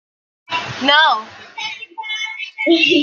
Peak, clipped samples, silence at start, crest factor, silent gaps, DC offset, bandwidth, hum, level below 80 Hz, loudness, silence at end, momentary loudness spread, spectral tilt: 0 dBFS; under 0.1%; 0.5 s; 18 dB; none; under 0.1%; 7.4 kHz; none; -66 dBFS; -17 LUFS; 0 s; 15 LU; -3 dB/octave